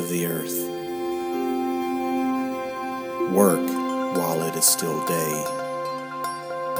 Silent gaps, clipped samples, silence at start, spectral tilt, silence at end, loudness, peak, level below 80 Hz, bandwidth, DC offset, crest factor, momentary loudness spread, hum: none; under 0.1%; 0 s; -4 dB/octave; 0 s; -24 LUFS; -4 dBFS; -66 dBFS; over 20 kHz; under 0.1%; 22 dB; 11 LU; none